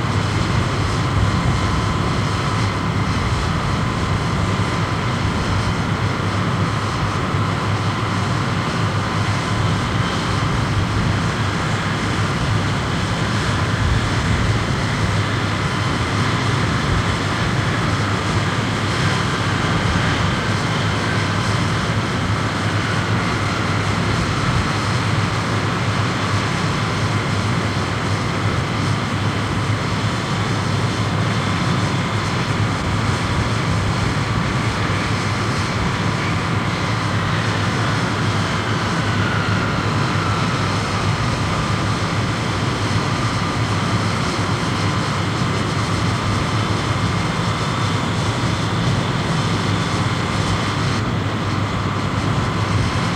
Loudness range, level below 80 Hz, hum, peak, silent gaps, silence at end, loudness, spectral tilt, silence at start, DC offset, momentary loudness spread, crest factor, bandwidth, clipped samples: 1 LU; -32 dBFS; none; -6 dBFS; none; 0 s; -19 LUFS; -5.5 dB/octave; 0 s; under 0.1%; 2 LU; 14 dB; 12.5 kHz; under 0.1%